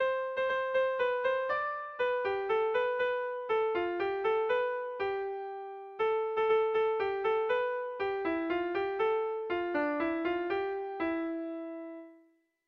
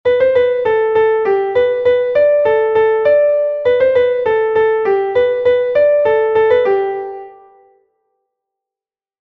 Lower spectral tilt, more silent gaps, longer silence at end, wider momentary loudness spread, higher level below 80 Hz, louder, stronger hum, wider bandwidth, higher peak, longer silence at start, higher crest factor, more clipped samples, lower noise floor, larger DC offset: about the same, -6 dB/octave vs -6.5 dB/octave; neither; second, 0.5 s vs 1.9 s; first, 7 LU vs 3 LU; second, -68 dBFS vs -52 dBFS; second, -32 LUFS vs -13 LUFS; neither; first, 6 kHz vs 4.8 kHz; second, -18 dBFS vs -2 dBFS; about the same, 0 s vs 0.05 s; about the same, 14 dB vs 12 dB; neither; second, -66 dBFS vs under -90 dBFS; neither